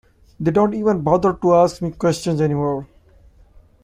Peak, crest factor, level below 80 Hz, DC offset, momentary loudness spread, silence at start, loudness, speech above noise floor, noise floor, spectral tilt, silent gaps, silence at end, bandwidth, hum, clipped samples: -2 dBFS; 16 dB; -46 dBFS; under 0.1%; 7 LU; 0.4 s; -18 LUFS; 32 dB; -49 dBFS; -7 dB/octave; none; 1 s; 15 kHz; none; under 0.1%